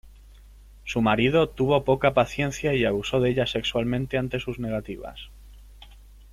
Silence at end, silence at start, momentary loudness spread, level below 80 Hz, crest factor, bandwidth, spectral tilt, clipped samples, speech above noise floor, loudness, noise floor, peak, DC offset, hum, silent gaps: 0.3 s; 0.05 s; 16 LU; -44 dBFS; 20 dB; 15 kHz; -6 dB/octave; under 0.1%; 24 dB; -24 LUFS; -48 dBFS; -6 dBFS; under 0.1%; none; none